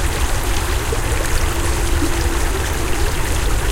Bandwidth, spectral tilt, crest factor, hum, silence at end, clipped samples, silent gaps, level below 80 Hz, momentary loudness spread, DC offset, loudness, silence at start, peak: 17 kHz; -4 dB/octave; 14 dB; none; 0 s; under 0.1%; none; -20 dBFS; 1 LU; under 0.1%; -20 LUFS; 0 s; -4 dBFS